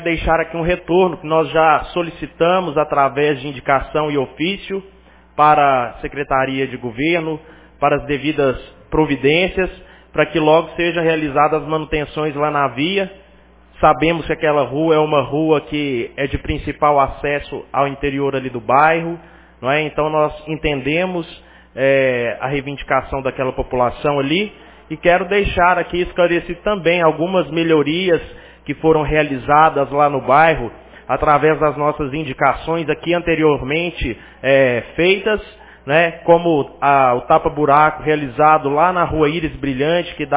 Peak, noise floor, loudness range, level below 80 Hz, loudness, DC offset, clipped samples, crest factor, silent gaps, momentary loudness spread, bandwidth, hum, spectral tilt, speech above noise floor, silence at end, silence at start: 0 dBFS; -47 dBFS; 4 LU; -38 dBFS; -17 LUFS; under 0.1%; under 0.1%; 16 dB; none; 10 LU; 4 kHz; none; -9.5 dB/octave; 31 dB; 0 s; 0 s